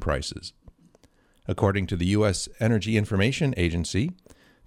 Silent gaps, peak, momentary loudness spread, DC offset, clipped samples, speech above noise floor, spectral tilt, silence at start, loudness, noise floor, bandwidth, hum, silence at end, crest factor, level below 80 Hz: none; -8 dBFS; 11 LU; under 0.1%; under 0.1%; 36 dB; -5.5 dB/octave; 0 s; -25 LUFS; -60 dBFS; 14 kHz; none; 0.55 s; 18 dB; -42 dBFS